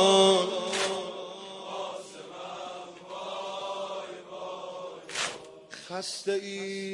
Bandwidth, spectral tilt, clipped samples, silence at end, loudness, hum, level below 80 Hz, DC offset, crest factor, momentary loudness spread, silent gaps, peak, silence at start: 11.5 kHz; -3 dB/octave; under 0.1%; 0 s; -31 LUFS; none; -80 dBFS; under 0.1%; 22 dB; 15 LU; none; -8 dBFS; 0 s